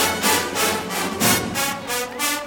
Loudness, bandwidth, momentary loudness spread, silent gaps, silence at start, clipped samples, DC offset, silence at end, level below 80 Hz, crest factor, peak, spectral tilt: -20 LUFS; over 20 kHz; 7 LU; none; 0 s; under 0.1%; under 0.1%; 0 s; -52 dBFS; 18 dB; -4 dBFS; -2 dB/octave